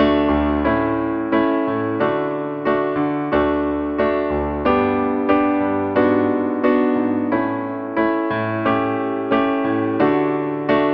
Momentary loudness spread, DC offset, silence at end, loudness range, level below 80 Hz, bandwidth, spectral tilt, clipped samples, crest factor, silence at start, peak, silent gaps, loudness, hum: 4 LU; under 0.1%; 0 s; 2 LU; -40 dBFS; 5.2 kHz; -9.5 dB/octave; under 0.1%; 14 dB; 0 s; -4 dBFS; none; -19 LUFS; none